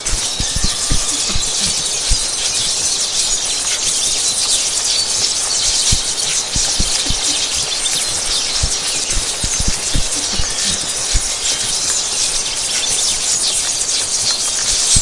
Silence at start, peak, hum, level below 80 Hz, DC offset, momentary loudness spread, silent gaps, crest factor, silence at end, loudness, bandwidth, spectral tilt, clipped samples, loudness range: 0 s; 0 dBFS; none; -28 dBFS; under 0.1%; 3 LU; none; 16 dB; 0 s; -14 LUFS; 11.5 kHz; 0 dB/octave; under 0.1%; 2 LU